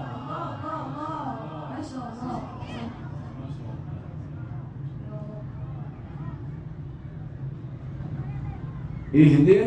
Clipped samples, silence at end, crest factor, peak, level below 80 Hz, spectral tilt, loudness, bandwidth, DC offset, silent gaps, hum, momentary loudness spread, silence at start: under 0.1%; 0 s; 22 dB; -4 dBFS; -48 dBFS; -9.5 dB/octave; -29 LUFS; 8.4 kHz; under 0.1%; none; none; 8 LU; 0 s